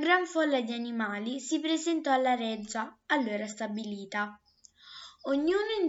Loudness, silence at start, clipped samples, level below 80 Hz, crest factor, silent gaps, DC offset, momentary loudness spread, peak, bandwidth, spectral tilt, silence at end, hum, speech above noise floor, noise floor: -31 LUFS; 0 s; under 0.1%; -72 dBFS; 20 dB; none; under 0.1%; 11 LU; -12 dBFS; 8 kHz; -3.5 dB/octave; 0 s; none; 27 dB; -57 dBFS